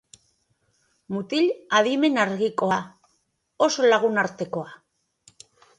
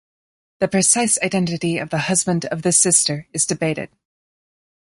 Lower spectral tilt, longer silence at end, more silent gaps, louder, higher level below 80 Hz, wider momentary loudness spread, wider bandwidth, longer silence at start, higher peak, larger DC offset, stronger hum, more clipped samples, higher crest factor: about the same, -4 dB/octave vs -3 dB/octave; about the same, 1.05 s vs 1 s; neither; second, -23 LUFS vs -17 LUFS; second, -70 dBFS vs -58 dBFS; first, 14 LU vs 9 LU; about the same, 11 kHz vs 11.5 kHz; first, 1.1 s vs 0.6 s; second, -6 dBFS vs -2 dBFS; neither; neither; neither; about the same, 18 dB vs 20 dB